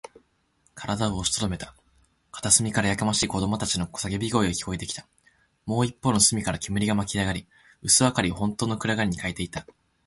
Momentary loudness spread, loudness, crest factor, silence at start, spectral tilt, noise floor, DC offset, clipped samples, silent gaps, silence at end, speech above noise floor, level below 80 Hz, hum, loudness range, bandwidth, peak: 15 LU; -24 LUFS; 22 dB; 0.75 s; -3.5 dB/octave; -67 dBFS; under 0.1%; under 0.1%; none; 0.45 s; 42 dB; -46 dBFS; none; 3 LU; 12 kHz; -4 dBFS